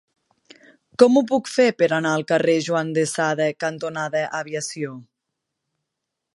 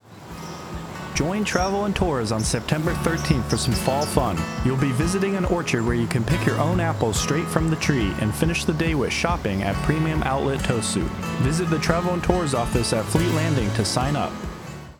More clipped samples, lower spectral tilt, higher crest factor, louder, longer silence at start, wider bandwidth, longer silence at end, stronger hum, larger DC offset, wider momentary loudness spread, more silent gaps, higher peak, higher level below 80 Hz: neither; about the same, -4.5 dB/octave vs -5 dB/octave; about the same, 22 dB vs 20 dB; about the same, -21 LUFS vs -22 LUFS; first, 1 s vs 0.05 s; second, 11.5 kHz vs 19.5 kHz; first, 1.35 s vs 0.05 s; neither; neither; first, 12 LU vs 4 LU; neither; about the same, -2 dBFS vs -2 dBFS; second, -72 dBFS vs -36 dBFS